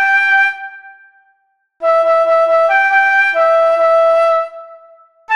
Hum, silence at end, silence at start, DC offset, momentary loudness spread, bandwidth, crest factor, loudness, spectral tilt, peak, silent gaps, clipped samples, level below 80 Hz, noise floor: none; 0 s; 0 s; under 0.1%; 8 LU; 10 kHz; 10 dB; -11 LUFS; -0.5 dB/octave; -2 dBFS; none; under 0.1%; -68 dBFS; -61 dBFS